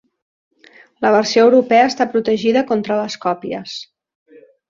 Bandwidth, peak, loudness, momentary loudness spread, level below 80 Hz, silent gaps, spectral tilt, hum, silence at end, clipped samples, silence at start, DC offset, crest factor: 7.6 kHz; -2 dBFS; -16 LUFS; 14 LU; -62 dBFS; none; -4.5 dB/octave; none; 0.85 s; under 0.1%; 1 s; under 0.1%; 16 dB